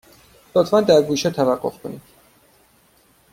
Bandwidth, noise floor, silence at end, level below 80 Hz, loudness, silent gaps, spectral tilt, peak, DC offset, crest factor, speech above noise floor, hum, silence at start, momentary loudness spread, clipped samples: 16.5 kHz; -57 dBFS; 1.35 s; -58 dBFS; -18 LUFS; none; -5 dB/octave; -2 dBFS; under 0.1%; 18 dB; 39 dB; none; 0.55 s; 20 LU; under 0.1%